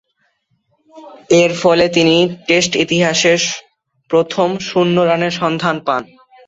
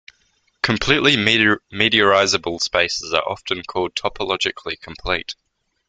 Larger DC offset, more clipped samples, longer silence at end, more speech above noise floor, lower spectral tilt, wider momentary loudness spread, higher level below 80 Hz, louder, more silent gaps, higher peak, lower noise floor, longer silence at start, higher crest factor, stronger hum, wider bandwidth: neither; neither; about the same, 0.45 s vs 0.55 s; first, 50 dB vs 44 dB; about the same, -4 dB/octave vs -3 dB/octave; second, 6 LU vs 11 LU; second, -54 dBFS vs -46 dBFS; first, -14 LUFS vs -18 LUFS; neither; about the same, 0 dBFS vs 0 dBFS; about the same, -64 dBFS vs -64 dBFS; first, 0.95 s vs 0.65 s; about the same, 16 dB vs 20 dB; neither; second, 8 kHz vs 9.4 kHz